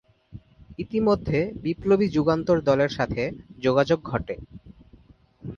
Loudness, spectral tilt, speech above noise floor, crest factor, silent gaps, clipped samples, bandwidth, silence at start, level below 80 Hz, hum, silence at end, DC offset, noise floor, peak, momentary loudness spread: -24 LUFS; -7.5 dB/octave; 31 dB; 18 dB; none; under 0.1%; 7.2 kHz; 0.35 s; -48 dBFS; none; 0 s; under 0.1%; -54 dBFS; -6 dBFS; 15 LU